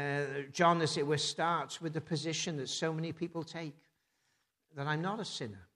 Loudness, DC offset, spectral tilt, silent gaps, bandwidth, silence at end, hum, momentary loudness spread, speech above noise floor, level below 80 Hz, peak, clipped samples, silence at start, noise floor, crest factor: -35 LUFS; under 0.1%; -4.5 dB/octave; none; 12 kHz; 0.1 s; none; 12 LU; 44 dB; -78 dBFS; -14 dBFS; under 0.1%; 0 s; -79 dBFS; 20 dB